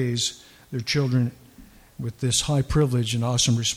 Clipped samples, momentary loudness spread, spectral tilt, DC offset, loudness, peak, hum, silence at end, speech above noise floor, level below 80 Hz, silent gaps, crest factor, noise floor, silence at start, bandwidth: under 0.1%; 11 LU; -4.5 dB/octave; under 0.1%; -23 LUFS; -6 dBFS; none; 0 s; 26 dB; -44 dBFS; none; 18 dB; -49 dBFS; 0 s; 15.5 kHz